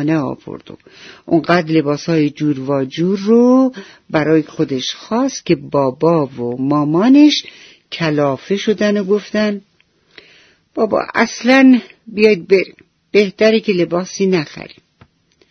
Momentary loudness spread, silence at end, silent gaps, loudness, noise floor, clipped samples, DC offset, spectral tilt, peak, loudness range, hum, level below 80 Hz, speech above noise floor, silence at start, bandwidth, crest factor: 11 LU; 0.85 s; none; -15 LUFS; -56 dBFS; under 0.1%; under 0.1%; -6 dB/octave; 0 dBFS; 4 LU; none; -58 dBFS; 41 dB; 0 s; 6.6 kHz; 16 dB